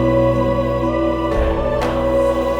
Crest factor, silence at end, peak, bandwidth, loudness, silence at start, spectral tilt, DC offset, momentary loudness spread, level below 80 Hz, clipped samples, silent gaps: 12 dB; 0 s; -4 dBFS; 15.5 kHz; -18 LUFS; 0 s; -7.5 dB/octave; under 0.1%; 3 LU; -26 dBFS; under 0.1%; none